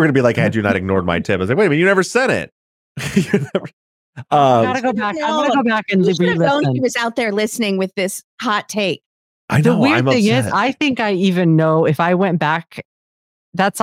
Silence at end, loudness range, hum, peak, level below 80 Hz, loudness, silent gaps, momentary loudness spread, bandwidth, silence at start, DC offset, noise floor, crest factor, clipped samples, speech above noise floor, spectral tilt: 0 s; 3 LU; none; -2 dBFS; -56 dBFS; -16 LUFS; 2.52-2.95 s, 3.73-4.13 s, 8.24-8.38 s, 9.06-9.48 s, 12.85-13.52 s; 9 LU; 16 kHz; 0 s; under 0.1%; under -90 dBFS; 14 dB; under 0.1%; over 74 dB; -5.5 dB/octave